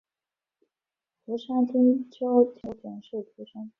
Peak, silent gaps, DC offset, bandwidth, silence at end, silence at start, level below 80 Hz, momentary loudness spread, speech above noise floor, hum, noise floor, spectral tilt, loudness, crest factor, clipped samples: -10 dBFS; none; under 0.1%; 4 kHz; 0.1 s; 1.3 s; -68 dBFS; 18 LU; over 64 dB; none; under -90 dBFS; -9 dB/octave; -25 LUFS; 18 dB; under 0.1%